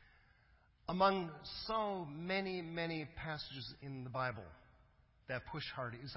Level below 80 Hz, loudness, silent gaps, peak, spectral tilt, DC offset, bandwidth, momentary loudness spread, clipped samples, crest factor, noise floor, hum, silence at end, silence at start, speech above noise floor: -66 dBFS; -41 LUFS; none; -20 dBFS; -8.5 dB/octave; under 0.1%; 5.8 kHz; 14 LU; under 0.1%; 22 dB; -70 dBFS; none; 0 s; 0 s; 29 dB